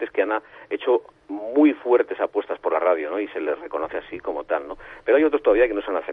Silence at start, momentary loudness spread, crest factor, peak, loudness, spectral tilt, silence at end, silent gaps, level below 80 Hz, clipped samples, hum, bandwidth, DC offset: 0 s; 12 LU; 16 dB; -6 dBFS; -23 LUFS; -7 dB/octave; 0 s; none; -54 dBFS; under 0.1%; none; 3.9 kHz; under 0.1%